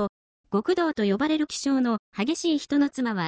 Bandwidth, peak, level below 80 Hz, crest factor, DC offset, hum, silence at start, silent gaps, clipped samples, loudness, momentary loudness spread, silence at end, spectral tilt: 8 kHz; -12 dBFS; -64 dBFS; 14 dB; under 0.1%; none; 0 s; 0.09-0.44 s, 1.99-2.12 s; under 0.1%; -25 LUFS; 4 LU; 0 s; -5 dB/octave